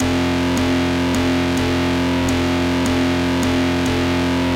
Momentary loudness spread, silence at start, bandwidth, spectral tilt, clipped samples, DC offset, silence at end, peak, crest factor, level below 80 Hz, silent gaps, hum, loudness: 1 LU; 0 s; 16 kHz; -5.5 dB/octave; under 0.1%; 0.2%; 0 s; -10 dBFS; 8 dB; -34 dBFS; none; none; -18 LUFS